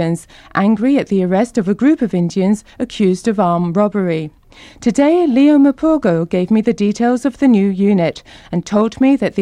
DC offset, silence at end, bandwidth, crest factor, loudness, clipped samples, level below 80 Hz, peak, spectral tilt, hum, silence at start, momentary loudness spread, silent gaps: under 0.1%; 0 s; 11 kHz; 12 dB; -15 LUFS; under 0.1%; -48 dBFS; -2 dBFS; -7 dB/octave; none; 0 s; 9 LU; none